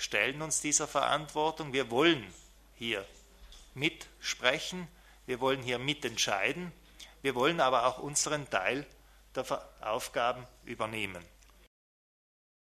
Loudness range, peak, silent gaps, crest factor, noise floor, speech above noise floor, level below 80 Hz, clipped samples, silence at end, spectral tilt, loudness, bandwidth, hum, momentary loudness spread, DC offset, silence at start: 6 LU; -8 dBFS; none; 26 dB; -54 dBFS; 22 dB; -60 dBFS; under 0.1%; 1.35 s; -2.5 dB/octave; -32 LUFS; 13.5 kHz; none; 17 LU; under 0.1%; 0 s